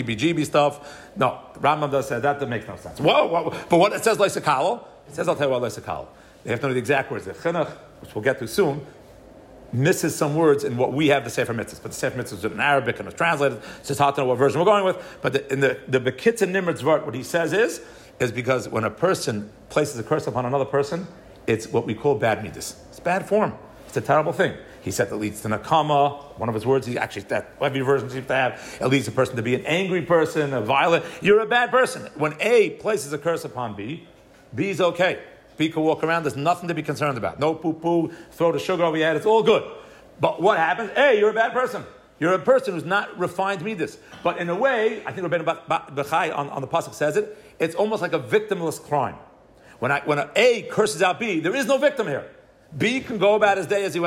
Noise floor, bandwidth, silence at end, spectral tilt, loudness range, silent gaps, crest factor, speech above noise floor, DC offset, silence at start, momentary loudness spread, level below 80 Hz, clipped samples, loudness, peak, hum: -50 dBFS; 16 kHz; 0 s; -5 dB/octave; 4 LU; none; 16 dB; 28 dB; under 0.1%; 0 s; 11 LU; -58 dBFS; under 0.1%; -22 LUFS; -6 dBFS; none